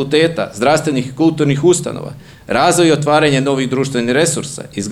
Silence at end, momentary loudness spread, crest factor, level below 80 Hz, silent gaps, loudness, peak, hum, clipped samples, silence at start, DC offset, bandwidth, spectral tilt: 0 s; 11 LU; 14 dB; -50 dBFS; none; -14 LUFS; 0 dBFS; none; under 0.1%; 0 s; 0.1%; 15 kHz; -4.5 dB/octave